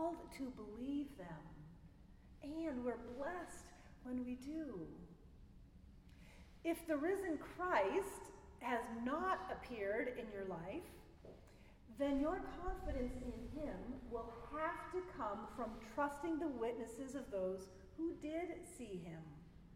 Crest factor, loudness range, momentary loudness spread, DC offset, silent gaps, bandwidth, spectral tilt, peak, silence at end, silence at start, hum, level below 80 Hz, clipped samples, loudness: 22 dB; 7 LU; 21 LU; under 0.1%; none; 16 kHz; -6 dB/octave; -22 dBFS; 0 s; 0 s; none; -60 dBFS; under 0.1%; -45 LUFS